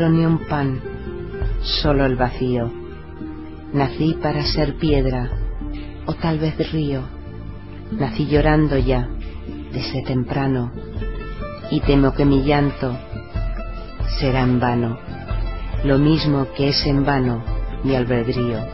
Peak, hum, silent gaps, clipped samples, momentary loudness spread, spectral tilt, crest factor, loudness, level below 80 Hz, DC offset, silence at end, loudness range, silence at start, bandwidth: -2 dBFS; none; none; under 0.1%; 15 LU; -9.5 dB/octave; 18 dB; -21 LUFS; -28 dBFS; 0.9%; 0 s; 4 LU; 0 s; 6 kHz